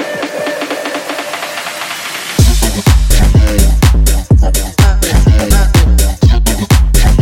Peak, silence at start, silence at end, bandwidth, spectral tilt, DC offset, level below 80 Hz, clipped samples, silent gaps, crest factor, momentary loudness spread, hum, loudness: 0 dBFS; 0 s; 0 s; 16.5 kHz; -5 dB/octave; under 0.1%; -10 dBFS; under 0.1%; none; 8 dB; 9 LU; none; -11 LUFS